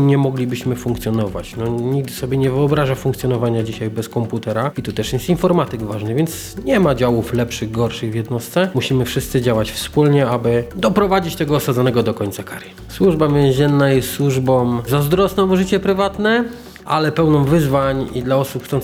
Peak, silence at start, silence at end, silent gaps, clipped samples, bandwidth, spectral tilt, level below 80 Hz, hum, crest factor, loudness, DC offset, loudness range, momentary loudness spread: -2 dBFS; 0 s; 0 s; none; under 0.1%; 16.5 kHz; -6.5 dB/octave; -38 dBFS; none; 14 dB; -17 LUFS; under 0.1%; 4 LU; 8 LU